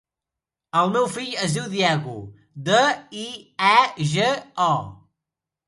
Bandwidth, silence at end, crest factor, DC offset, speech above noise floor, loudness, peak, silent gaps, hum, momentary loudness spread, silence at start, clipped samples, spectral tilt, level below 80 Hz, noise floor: 11.5 kHz; 0.7 s; 22 dB; under 0.1%; 66 dB; -21 LUFS; 0 dBFS; none; none; 16 LU; 0.75 s; under 0.1%; -4 dB/octave; -62 dBFS; -87 dBFS